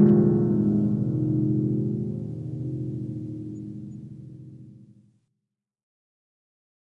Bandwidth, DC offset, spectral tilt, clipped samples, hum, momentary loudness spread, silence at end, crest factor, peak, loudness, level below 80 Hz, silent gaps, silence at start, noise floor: 2 kHz; under 0.1%; -12.5 dB/octave; under 0.1%; none; 20 LU; 2.1 s; 20 dB; -6 dBFS; -25 LUFS; -64 dBFS; none; 0 s; -84 dBFS